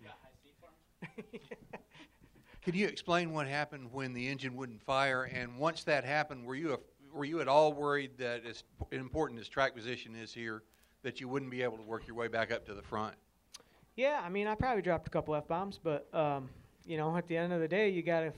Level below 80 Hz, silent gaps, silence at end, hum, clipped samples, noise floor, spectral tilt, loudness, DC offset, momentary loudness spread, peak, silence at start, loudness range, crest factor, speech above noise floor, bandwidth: -62 dBFS; none; 0 s; none; under 0.1%; -65 dBFS; -6 dB/octave; -36 LUFS; under 0.1%; 18 LU; -14 dBFS; 0 s; 6 LU; 22 dB; 29 dB; 12.5 kHz